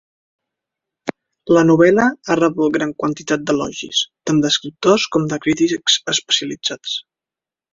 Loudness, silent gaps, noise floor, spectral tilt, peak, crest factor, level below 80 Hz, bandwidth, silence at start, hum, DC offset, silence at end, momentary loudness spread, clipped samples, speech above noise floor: -17 LUFS; none; -89 dBFS; -4 dB/octave; -2 dBFS; 16 dB; -56 dBFS; 7.8 kHz; 1.05 s; none; under 0.1%; 0.7 s; 12 LU; under 0.1%; 72 dB